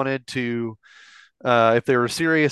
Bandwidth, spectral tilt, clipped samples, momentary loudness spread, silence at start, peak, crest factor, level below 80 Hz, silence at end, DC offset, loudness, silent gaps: 12.5 kHz; -5.5 dB/octave; under 0.1%; 12 LU; 0 s; -4 dBFS; 18 dB; -64 dBFS; 0 s; under 0.1%; -21 LUFS; none